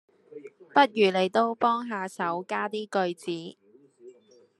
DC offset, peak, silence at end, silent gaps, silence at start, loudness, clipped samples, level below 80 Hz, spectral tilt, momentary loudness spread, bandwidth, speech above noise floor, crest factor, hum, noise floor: under 0.1%; -6 dBFS; 0.5 s; none; 0.35 s; -26 LUFS; under 0.1%; -82 dBFS; -5 dB/octave; 20 LU; 12.5 kHz; 31 dB; 22 dB; none; -57 dBFS